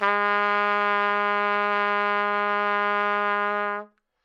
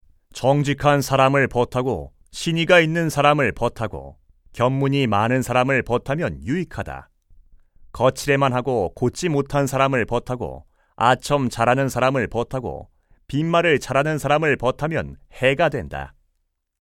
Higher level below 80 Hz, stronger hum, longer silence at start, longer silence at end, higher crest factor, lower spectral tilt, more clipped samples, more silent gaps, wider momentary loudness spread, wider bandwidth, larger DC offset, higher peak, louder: second, -76 dBFS vs -44 dBFS; neither; second, 0 s vs 0.35 s; second, 0.4 s vs 0.7 s; about the same, 16 dB vs 20 dB; about the same, -5 dB/octave vs -5.5 dB/octave; neither; neither; second, 3 LU vs 13 LU; second, 7.6 kHz vs 17 kHz; neither; second, -8 dBFS vs -2 dBFS; second, -23 LUFS vs -20 LUFS